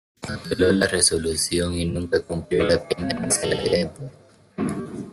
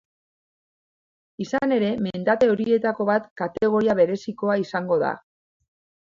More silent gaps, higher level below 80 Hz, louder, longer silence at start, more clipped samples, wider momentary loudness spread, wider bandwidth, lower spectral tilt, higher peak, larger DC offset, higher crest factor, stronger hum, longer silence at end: second, none vs 3.31-3.36 s; first, -48 dBFS vs -62 dBFS; about the same, -22 LUFS vs -22 LUFS; second, 0.2 s vs 1.4 s; neither; first, 14 LU vs 8 LU; first, 12.5 kHz vs 7.4 kHz; second, -3.5 dB/octave vs -7 dB/octave; first, -4 dBFS vs -8 dBFS; neither; about the same, 20 dB vs 16 dB; neither; second, 0 s vs 0.95 s